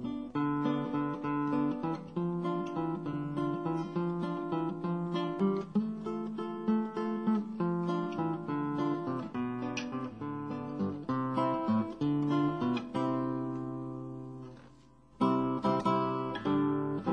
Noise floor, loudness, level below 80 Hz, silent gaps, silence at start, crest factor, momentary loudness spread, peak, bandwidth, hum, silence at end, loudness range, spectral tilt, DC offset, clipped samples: -59 dBFS; -33 LUFS; -66 dBFS; none; 0 s; 16 dB; 8 LU; -16 dBFS; 9.2 kHz; none; 0 s; 2 LU; -8 dB/octave; under 0.1%; under 0.1%